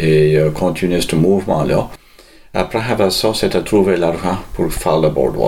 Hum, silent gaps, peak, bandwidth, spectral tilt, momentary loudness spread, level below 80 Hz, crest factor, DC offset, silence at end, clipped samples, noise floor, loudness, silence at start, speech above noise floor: none; none; -2 dBFS; 16.5 kHz; -6 dB/octave; 7 LU; -34 dBFS; 14 dB; 0.3%; 0 s; under 0.1%; -43 dBFS; -16 LUFS; 0 s; 28 dB